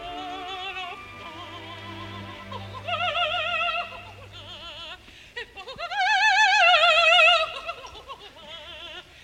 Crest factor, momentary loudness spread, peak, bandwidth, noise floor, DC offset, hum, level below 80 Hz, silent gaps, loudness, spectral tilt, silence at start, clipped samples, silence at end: 20 dB; 24 LU; -6 dBFS; 14 kHz; -44 dBFS; under 0.1%; none; -56 dBFS; none; -20 LUFS; -1.5 dB/octave; 0 s; under 0.1%; 0.2 s